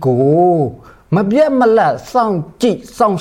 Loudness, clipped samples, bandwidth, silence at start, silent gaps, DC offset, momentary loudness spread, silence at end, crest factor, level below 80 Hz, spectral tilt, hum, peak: -14 LUFS; under 0.1%; 16 kHz; 0 s; none; under 0.1%; 6 LU; 0 s; 12 dB; -48 dBFS; -7.5 dB/octave; none; -2 dBFS